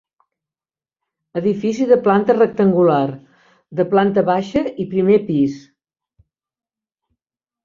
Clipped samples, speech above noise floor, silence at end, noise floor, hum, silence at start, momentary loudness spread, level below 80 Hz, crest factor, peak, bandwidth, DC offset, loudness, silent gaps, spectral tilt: under 0.1%; over 74 dB; 2.05 s; under -90 dBFS; none; 1.35 s; 10 LU; -58 dBFS; 16 dB; -2 dBFS; 7.4 kHz; under 0.1%; -17 LUFS; none; -8 dB/octave